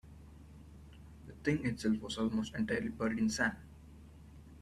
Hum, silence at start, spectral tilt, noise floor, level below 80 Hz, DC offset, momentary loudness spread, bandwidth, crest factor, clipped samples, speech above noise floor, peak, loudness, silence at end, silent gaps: none; 0.05 s; -5 dB/octave; -55 dBFS; -58 dBFS; under 0.1%; 22 LU; 12.5 kHz; 18 dB; under 0.1%; 20 dB; -18 dBFS; -35 LUFS; 0 s; none